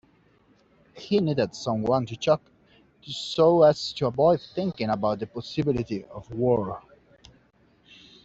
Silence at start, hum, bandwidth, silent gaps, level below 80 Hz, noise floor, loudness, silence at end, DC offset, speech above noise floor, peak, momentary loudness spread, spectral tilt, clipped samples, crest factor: 0.95 s; none; 8 kHz; none; -58 dBFS; -62 dBFS; -25 LUFS; 1.45 s; under 0.1%; 37 dB; -6 dBFS; 14 LU; -6.5 dB/octave; under 0.1%; 20 dB